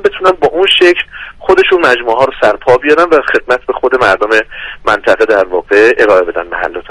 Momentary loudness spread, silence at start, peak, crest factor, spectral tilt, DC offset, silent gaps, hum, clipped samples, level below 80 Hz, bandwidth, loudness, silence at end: 9 LU; 0 s; 0 dBFS; 10 dB; -4 dB/octave; under 0.1%; none; none; 0.7%; -38 dBFS; 11.5 kHz; -9 LUFS; 0.1 s